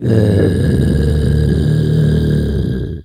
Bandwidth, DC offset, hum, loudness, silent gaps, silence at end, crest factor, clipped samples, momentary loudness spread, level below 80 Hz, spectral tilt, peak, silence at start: 12.5 kHz; under 0.1%; none; -14 LUFS; none; 0 s; 12 dB; under 0.1%; 4 LU; -22 dBFS; -8.5 dB/octave; 0 dBFS; 0 s